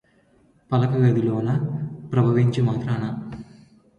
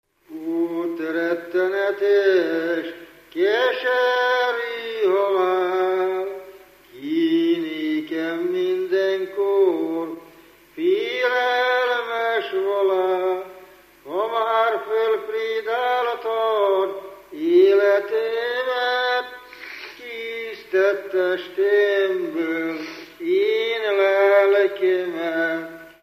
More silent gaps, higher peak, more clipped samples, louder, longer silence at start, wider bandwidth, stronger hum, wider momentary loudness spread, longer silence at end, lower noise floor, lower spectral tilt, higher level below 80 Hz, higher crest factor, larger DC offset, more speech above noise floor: neither; about the same, -6 dBFS vs -6 dBFS; neither; about the same, -22 LUFS vs -21 LUFS; first, 0.7 s vs 0.3 s; second, 7 kHz vs 15 kHz; second, none vs 50 Hz at -75 dBFS; about the same, 12 LU vs 13 LU; first, 0.55 s vs 0.15 s; first, -59 dBFS vs -49 dBFS; first, -9 dB/octave vs -4.5 dB/octave; first, -54 dBFS vs -70 dBFS; about the same, 16 dB vs 16 dB; neither; first, 39 dB vs 29 dB